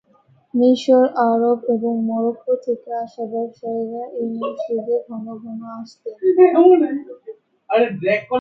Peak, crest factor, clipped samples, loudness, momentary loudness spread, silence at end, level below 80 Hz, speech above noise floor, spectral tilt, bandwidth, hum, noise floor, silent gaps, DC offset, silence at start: -2 dBFS; 18 dB; under 0.1%; -18 LUFS; 18 LU; 0 s; -70 dBFS; 38 dB; -7 dB/octave; 7.4 kHz; none; -56 dBFS; none; under 0.1%; 0.55 s